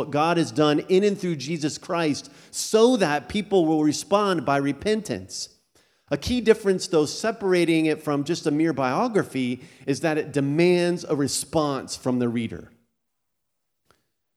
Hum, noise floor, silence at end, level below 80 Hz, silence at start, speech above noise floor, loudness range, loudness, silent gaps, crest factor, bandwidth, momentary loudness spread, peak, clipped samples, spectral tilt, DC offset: none; -81 dBFS; 1.7 s; -54 dBFS; 0 s; 58 dB; 2 LU; -23 LUFS; none; 20 dB; 15.5 kHz; 10 LU; -4 dBFS; under 0.1%; -5 dB/octave; under 0.1%